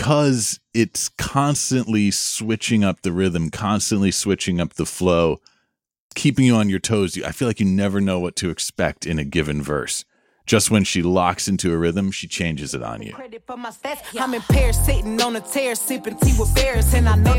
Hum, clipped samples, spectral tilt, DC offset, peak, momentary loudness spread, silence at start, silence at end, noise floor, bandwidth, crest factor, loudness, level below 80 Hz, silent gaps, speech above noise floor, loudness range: none; under 0.1%; -4.5 dB/octave; under 0.1%; -2 dBFS; 10 LU; 0 s; 0 s; -72 dBFS; 17 kHz; 18 dB; -20 LUFS; -28 dBFS; 5.98-6.10 s; 52 dB; 3 LU